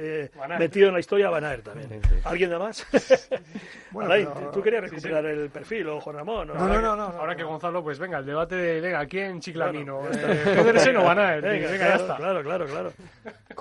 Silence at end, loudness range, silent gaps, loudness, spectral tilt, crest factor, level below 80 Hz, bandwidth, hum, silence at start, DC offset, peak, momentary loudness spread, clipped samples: 0 s; 6 LU; none; -24 LUFS; -5.5 dB/octave; 22 dB; -36 dBFS; 11.5 kHz; none; 0 s; under 0.1%; -4 dBFS; 13 LU; under 0.1%